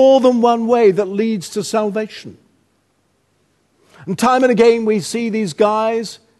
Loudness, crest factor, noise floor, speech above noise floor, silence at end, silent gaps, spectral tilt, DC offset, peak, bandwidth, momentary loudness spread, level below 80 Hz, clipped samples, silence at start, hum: -15 LUFS; 16 dB; -62 dBFS; 48 dB; 0.25 s; none; -5 dB/octave; under 0.1%; 0 dBFS; 12.5 kHz; 12 LU; -62 dBFS; under 0.1%; 0 s; none